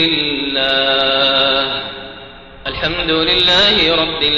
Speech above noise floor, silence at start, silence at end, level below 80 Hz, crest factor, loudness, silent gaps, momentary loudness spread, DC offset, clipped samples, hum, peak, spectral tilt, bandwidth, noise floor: 21 dB; 0 s; 0 s; -38 dBFS; 12 dB; -13 LUFS; none; 16 LU; 0.2%; under 0.1%; none; -2 dBFS; -4 dB/octave; 8.2 kHz; -35 dBFS